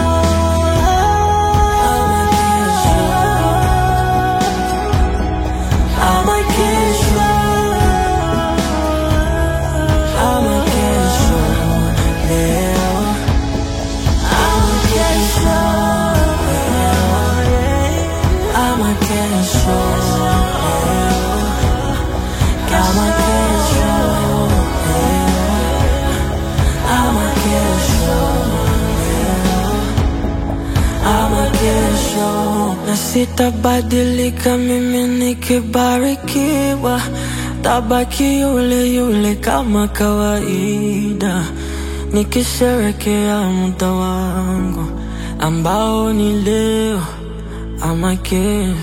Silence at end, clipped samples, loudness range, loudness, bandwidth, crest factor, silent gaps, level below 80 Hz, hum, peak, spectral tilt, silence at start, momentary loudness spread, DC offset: 0 s; under 0.1%; 3 LU; -15 LUFS; 16.5 kHz; 14 dB; none; -20 dBFS; none; 0 dBFS; -5 dB/octave; 0 s; 5 LU; under 0.1%